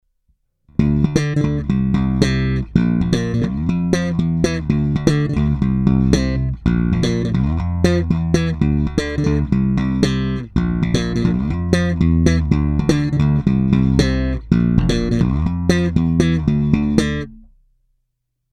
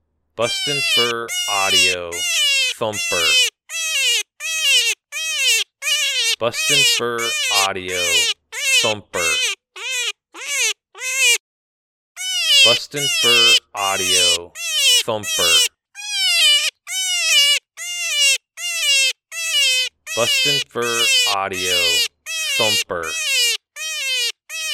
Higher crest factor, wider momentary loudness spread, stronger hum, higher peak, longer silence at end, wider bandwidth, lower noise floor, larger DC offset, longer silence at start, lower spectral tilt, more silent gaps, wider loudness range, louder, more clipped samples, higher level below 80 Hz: about the same, 16 dB vs 18 dB; second, 4 LU vs 10 LU; neither; about the same, 0 dBFS vs 0 dBFS; first, 1.15 s vs 0 s; second, 11.5 kHz vs 19 kHz; second, -73 dBFS vs under -90 dBFS; neither; first, 0.8 s vs 0.35 s; first, -7 dB/octave vs 0.5 dB/octave; second, none vs 11.40-12.15 s; about the same, 2 LU vs 4 LU; about the same, -18 LUFS vs -16 LUFS; neither; first, -26 dBFS vs -62 dBFS